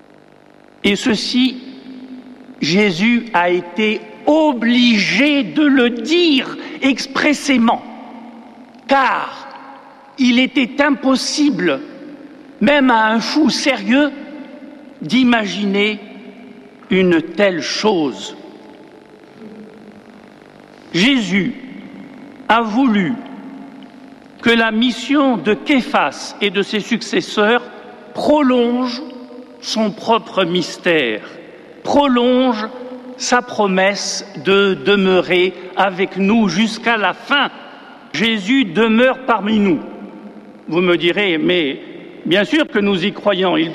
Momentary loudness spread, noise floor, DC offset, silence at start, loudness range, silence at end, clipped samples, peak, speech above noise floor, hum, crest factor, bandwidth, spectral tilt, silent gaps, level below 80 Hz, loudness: 21 LU; -46 dBFS; under 0.1%; 0.85 s; 5 LU; 0 s; under 0.1%; -2 dBFS; 31 dB; none; 14 dB; 12 kHz; -4.5 dB/octave; none; -54 dBFS; -15 LUFS